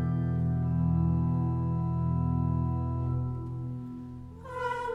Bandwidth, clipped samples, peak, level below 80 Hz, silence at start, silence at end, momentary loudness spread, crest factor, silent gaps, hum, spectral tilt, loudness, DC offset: 3.9 kHz; under 0.1%; -18 dBFS; -42 dBFS; 0 s; 0 s; 13 LU; 12 dB; none; none; -10 dB/octave; -30 LUFS; under 0.1%